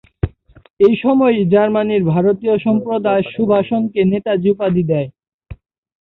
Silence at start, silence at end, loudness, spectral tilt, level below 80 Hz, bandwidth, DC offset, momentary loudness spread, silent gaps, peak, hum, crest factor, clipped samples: 0.25 s; 0.5 s; -15 LUFS; -10.5 dB/octave; -42 dBFS; 4.1 kHz; under 0.1%; 6 LU; 0.73-0.77 s, 5.34-5.39 s; -2 dBFS; none; 14 dB; under 0.1%